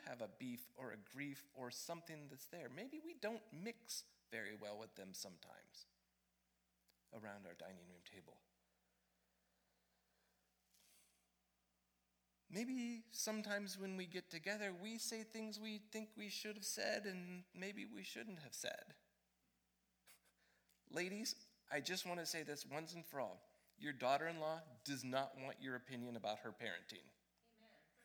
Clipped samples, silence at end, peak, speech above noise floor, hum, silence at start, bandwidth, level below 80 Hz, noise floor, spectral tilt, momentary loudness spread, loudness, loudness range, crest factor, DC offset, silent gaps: under 0.1%; 0 s; -26 dBFS; 36 dB; none; 0 s; over 20 kHz; under -90 dBFS; -85 dBFS; -3 dB/octave; 13 LU; -48 LUFS; 15 LU; 26 dB; under 0.1%; none